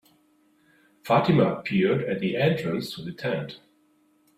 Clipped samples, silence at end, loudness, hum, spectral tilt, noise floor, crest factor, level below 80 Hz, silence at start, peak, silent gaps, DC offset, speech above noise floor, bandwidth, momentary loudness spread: under 0.1%; 0.8 s; -25 LUFS; none; -7.5 dB/octave; -64 dBFS; 18 dB; -62 dBFS; 1.05 s; -8 dBFS; none; under 0.1%; 40 dB; 15.5 kHz; 14 LU